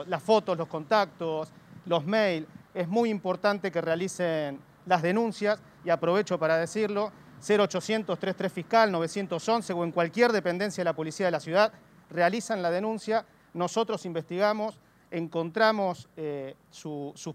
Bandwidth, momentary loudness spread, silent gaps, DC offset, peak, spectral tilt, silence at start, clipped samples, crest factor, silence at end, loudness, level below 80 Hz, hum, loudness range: 15 kHz; 12 LU; none; under 0.1%; -8 dBFS; -5 dB/octave; 0 s; under 0.1%; 20 dB; 0 s; -28 LUFS; -72 dBFS; none; 2 LU